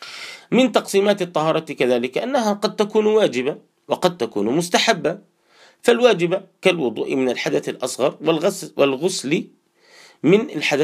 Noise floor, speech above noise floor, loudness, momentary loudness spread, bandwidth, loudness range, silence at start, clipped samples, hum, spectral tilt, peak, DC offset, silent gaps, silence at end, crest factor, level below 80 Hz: -53 dBFS; 34 dB; -20 LUFS; 7 LU; 15.5 kHz; 2 LU; 0 s; under 0.1%; none; -4.5 dB/octave; 0 dBFS; under 0.1%; none; 0 s; 20 dB; -70 dBFS